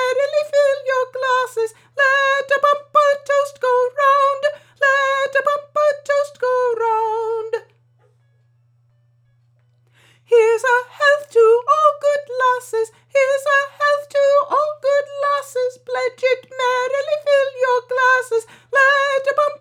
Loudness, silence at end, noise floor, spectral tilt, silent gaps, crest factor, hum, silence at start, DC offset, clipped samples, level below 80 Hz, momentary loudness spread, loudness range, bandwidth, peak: -17 LUFS; 0.05 s; -58 dBFS; -0.5 dB/octave; none; 16 dB; none; 0 s; under 0.1%; under 0.1%; -78 dBFS; 8 LU; 6 LU; 15 kHz; -2 dBFS